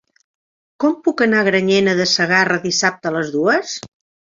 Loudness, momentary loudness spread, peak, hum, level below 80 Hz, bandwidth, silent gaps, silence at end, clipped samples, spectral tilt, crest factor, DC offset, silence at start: -16 LUFS; 7 LU; -2 dBFS; none; -60 dBFS; 7.8 kHz; none; 0.45 s; under 0.1%; -3.5 dB/octave; 16 dB; under 0.1%; 0.8 s